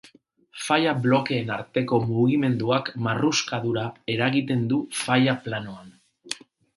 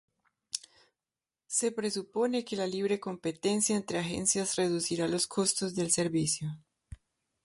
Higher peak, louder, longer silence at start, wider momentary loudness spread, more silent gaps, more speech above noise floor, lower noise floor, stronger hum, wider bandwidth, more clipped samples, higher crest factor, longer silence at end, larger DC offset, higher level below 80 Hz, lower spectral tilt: first, -4 dBFS vs -10 dBFS; first, -24 LUFS vs -31 LUFS; about the same, 0.55 s vs 0.55 s; first, 14 LU vs 9 LU; neither; second, 33 dB vs over 59 dB; second, -56 dBFS vs under -90 dBFS; neither; about the same, 11.5 kHz vs 11.5 kHz; neither; about the same, 20 dB vs 22 dB; about the same, 0.4 s vs 0.5 s; neither; about the same, -62 dBFS vs -64 dBFS; first, -5 dB/octave vs -3.5 dB/octave